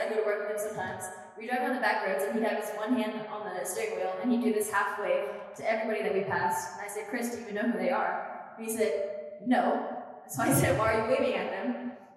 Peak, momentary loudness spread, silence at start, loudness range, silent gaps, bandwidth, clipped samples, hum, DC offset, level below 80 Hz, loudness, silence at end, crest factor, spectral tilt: -14 dBFS; 10 LU; 0 s; 3 LU; none; 16 kHz; under 0.1%; none; under 0.1%; -66 dBFS; -30 LUFS; 0 s; 18 dB; -4.5 dB/octave